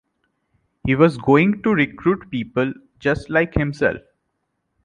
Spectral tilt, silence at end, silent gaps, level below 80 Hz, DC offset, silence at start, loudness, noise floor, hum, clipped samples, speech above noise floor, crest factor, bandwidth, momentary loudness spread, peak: -8 dB/octave; 0.85 s; none; -42 dBFS; under 0.1%; 0.85 s; -19 LUFS; -73 dBFS; none; under 0.1%; 55 dB; 18 dB; 10 kHz; 9 LU; -2 dBFS